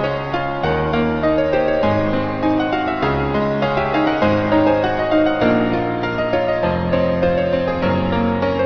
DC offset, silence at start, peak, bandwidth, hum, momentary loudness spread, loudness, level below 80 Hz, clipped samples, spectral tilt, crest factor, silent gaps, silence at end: under 0.1%; 0 s; -2 dBFS; 6.4 kHz; none; 4 LU; -18 LUFS; -38 dBFS; under 0.1%; -8 dB/octave; 14 dB; none; 0 s